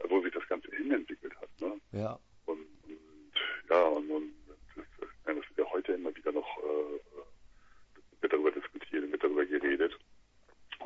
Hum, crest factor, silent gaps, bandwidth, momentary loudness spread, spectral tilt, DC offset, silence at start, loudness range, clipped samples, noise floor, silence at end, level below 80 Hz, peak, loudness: none; 22 dB; none; 7.2 kHz; 21 LU; -6.5 dB/octave; under 0.1%; 0 s; 4 LU; under 0.1%; -62 dBFS; 0 s; -66 dBFS; -14 dBFS; -34 LUFS